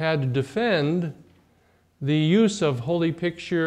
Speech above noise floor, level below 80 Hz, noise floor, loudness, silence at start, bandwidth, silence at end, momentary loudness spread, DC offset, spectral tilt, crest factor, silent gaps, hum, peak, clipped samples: 39 dB; -62 dBFS; -62 dBFS; -24 LUFS; 0 s; 10.5 kHz; 0 s; 9 LU; under 0.1%; -6.5 dB/octave; 14 dB; none; none; -8 dBFS; under 0.1%